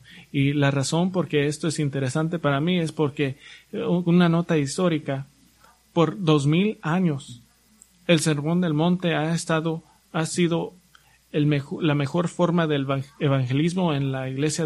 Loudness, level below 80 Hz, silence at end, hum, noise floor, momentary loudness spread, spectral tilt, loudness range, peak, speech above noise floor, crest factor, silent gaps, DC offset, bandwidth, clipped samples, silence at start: -23 LUFS; -60 dBFS; 0 s; none; -57 dBFS; 10 LU; -6 dB/octave; 2 LU; -6 dBFS; 35 dB; 18 dB; none; under 0.1%; 12 kHz; under 0.1%; 0.1 s